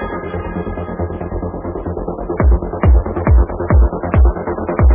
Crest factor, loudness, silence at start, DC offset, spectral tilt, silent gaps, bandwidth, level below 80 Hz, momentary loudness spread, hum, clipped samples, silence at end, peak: 14 dB; -17 LUFS; 0 s; under 0.1%; -13 dB/octave; none; 3.5 kHz; -16 dBFS; 9 LU; none; under 0.1%; 0 s; 0 dBFS